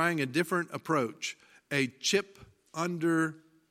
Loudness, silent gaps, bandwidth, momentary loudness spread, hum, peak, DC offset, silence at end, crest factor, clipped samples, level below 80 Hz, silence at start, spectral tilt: -31 LUFS; none; 16 kHz; 10 LU; none; -12 dBFS; under 0.1%; 0.35 s; 20 dB; under 0.1%; -74 dBFS; 0 s; -4 dB/octave